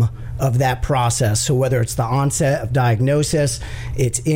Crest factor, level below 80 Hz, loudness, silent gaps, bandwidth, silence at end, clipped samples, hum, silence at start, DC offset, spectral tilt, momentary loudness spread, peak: 12 dB; -34 dBFS; -18 LUFS; none; 16.5 kHz; 0 s; under 0.1%; none; 0 s; under 0.1%; -5 dB/octave; 5 LU; -6 dBFS